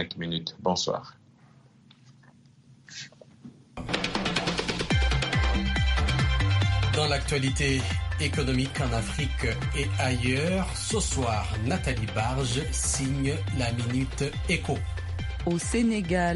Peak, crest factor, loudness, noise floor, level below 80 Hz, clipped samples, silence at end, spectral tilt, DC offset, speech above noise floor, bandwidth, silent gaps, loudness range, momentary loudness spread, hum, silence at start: -8 dBFS; 18 dB; -27 LUFS; -56 dBFS; -34 dBFS; under 0.1%; 0 s; -4.5 dB/octave; under 0.1%; 29 dB; 11.5 kHz; none; 8 LU; 7 LU; none; 0 s